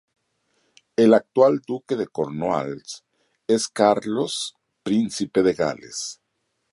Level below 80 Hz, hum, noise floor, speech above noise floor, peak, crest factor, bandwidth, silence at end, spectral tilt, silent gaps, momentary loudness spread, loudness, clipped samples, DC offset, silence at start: -62 dBFS; none; -74 dBFS; 53 dB; -4 dBFS; 20 dB; 11.5 kHz; 0.6 s; -4.5 dB/octave; none; 16 LU; -22 LUFS; under 0.1%; under 0.1%; 1 s